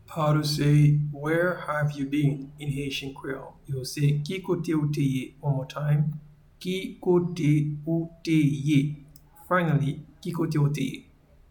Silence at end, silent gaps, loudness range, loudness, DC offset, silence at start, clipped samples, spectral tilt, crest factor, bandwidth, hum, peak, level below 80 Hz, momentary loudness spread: 0.5 s; none; 3 LU; -26 LUFS; under 0.1%; 0.1 s; under 0.1%; -7 dB/octave; 16 dB; 18 kHz; none; -10 dBFS; -54 dBFS; 11 LU